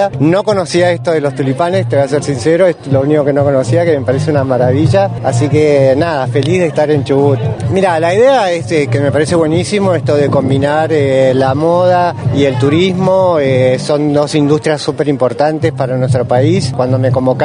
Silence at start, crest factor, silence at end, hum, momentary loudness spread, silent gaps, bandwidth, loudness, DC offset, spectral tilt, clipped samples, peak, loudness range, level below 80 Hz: 0 s; 10 dB; 0 s; none; 4 LU; none; 10.5 kHz; -11 LUFS; under 0.1%; -6.5 dB/octave; under 0.1%; 0 dBFS; 1 LU; -44 dBFS